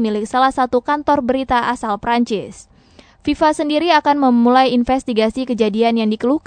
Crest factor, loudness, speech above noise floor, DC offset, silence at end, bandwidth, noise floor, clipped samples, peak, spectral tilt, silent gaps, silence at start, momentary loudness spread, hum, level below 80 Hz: 14 dB; -16 LUFS; 32 dB; under 0.1%; 0.1 s; 9.4 kHz; -47 dBFS; under 0.1%; -2 dBFS; -5 dB/octave; none; 0 s; 7 LU; none; -44 dBFS